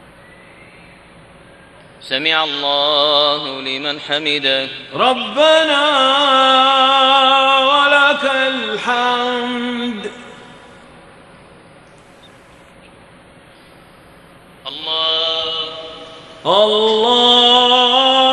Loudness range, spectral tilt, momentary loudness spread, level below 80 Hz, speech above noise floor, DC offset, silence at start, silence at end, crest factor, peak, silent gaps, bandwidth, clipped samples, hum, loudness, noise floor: 12 LU; -2.5 dB/octave; 13 LU; -58 dBFS; 30 dB; under 0.1%; 2 s; 0 s; 16 dB; 0 dBFS; none; 11.5 kHz; under 0.1%; none; -13 LUFS; -43 dBFS